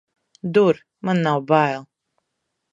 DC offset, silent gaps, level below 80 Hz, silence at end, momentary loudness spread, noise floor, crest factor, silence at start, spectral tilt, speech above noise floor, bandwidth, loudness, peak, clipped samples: under 0.1%; none; -70 dBFS; 0.9 s; 11 LU; -77 dBFS; 20 dB; 0.45 s; -7.5 dB/octave; 58 dB; 7.8 kHz; -20 LUFS; -2 dBFS; under 0.1%